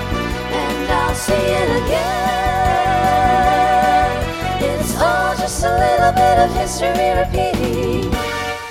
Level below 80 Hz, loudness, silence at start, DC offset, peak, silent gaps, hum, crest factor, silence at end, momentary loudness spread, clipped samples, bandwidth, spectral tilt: -28 dBFS; -16 LUFS; 0 s; under 0.1%; 0 dBFS; none; none; 16 dB; 0 s; 7 LU; under 0.1%; 16.5 kHz; -4.5 dB/octave